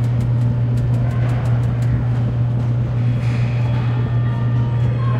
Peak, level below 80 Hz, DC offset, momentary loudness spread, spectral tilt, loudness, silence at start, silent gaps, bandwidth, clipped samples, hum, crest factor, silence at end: -8 dBFS; -32 dBFS; under 0.1%; 1 LU; -9 dB/octave; -18 LUFS; 0 s; none; 5 kHz; under 0.1%; none; 10 dB; 0 s